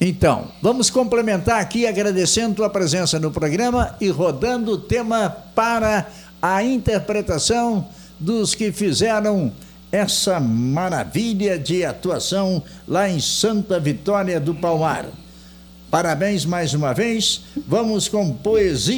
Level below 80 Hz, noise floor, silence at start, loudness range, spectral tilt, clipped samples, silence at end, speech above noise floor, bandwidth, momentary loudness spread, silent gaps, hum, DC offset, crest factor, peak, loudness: -42 dBFS; -43 dBFS; 0 s; 2 LU; -4.5 dB/octave; under 0.1%; 0 s; 23 dB; 19.5 kHz; 5 LU; none; none; under 0.1%; 18 dB; -2 dBFS; -20 LUFS